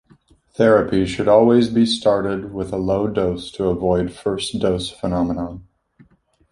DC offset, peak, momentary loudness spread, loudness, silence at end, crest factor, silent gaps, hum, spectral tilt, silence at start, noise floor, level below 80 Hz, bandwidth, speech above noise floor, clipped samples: under 0.1%; -2 dBFS; 10 LU; -19 LUFS; 0.9 s; 18 dB; none; none; -6 dB/octave; 0.6 s; -55 dBFS; -42 dBFS; 11.5 kHz; 37 dB; under 0.1%